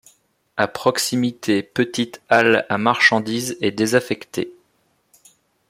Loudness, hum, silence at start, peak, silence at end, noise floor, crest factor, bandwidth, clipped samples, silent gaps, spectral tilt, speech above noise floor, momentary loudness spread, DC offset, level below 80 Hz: -19 LUFS; none; 0.55 s; 0 dBFS; 1.15 s; -65 dBFS; 20 dB; 16.5 kHz; under 0.1%; none; -4 dB/octave; 45 dB; 11 LU; under 0.1%; -62 dBFS